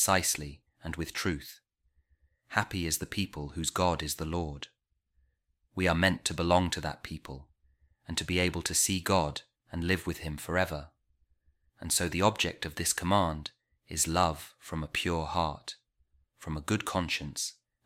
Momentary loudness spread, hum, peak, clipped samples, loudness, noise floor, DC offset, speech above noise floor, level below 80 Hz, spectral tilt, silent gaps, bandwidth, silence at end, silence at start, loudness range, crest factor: 16 LU; none; -10 dBFS; under 0.1%; -31 LUFS; -75 dBFS; under 0.1%; 44 dB; -50 dBFS; -3.5 dB/octave; none; 16.5 kHz; 0.35 s; 0 s; 4 LU; 24 dB